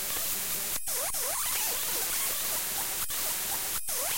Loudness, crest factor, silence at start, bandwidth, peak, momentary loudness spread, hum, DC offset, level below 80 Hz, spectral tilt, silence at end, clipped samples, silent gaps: -28 LUFS; 16 dB; 0 s; 16.5 kHz; -16 dBFS; 2 LU; none; 0.6%; -56 dBFS; 0.5 dB/octave; 0 s; under 0.1%; none